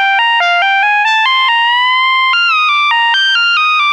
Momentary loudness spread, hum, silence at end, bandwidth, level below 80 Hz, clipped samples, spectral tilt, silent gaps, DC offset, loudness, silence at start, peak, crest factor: 1 LU; none; 0 s; 11.5 kHz; -70 dBFS; under 0.1%; 4 dB/octave; none; under 0.1%; -9 LUFS; 0 s; -2 dBFS; 10 dB